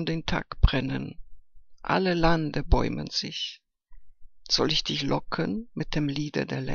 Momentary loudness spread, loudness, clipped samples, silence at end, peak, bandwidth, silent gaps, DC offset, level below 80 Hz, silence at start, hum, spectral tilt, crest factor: 10 LU; -27 LUFS; under 0.1%; 0 s; -4 dBFS; 7.2 kHz; none; under 0.1%; -34 dBFS; 0 s; none; -5 dB/octave; 24 dB